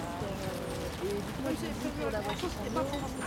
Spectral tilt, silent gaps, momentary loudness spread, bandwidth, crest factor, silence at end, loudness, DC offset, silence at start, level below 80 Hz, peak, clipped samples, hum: -5 dB/octave; none; 3 LU; 17 kHz; 16 dB; 0 s; -35 LUFS; under 0.1%; 0 s; -48 dBFS; -20 dBFS; under 0.1%; none